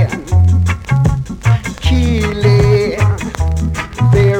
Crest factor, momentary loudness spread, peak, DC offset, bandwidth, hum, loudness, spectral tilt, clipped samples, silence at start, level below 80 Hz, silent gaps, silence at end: 10 dB; 6 LU; -2 dBFS; under 0.1%; 11 kHz; none; -14 LUFS; -7 dB/octave; under 0.1%; 0 s; -22 dBFS; none; 0 s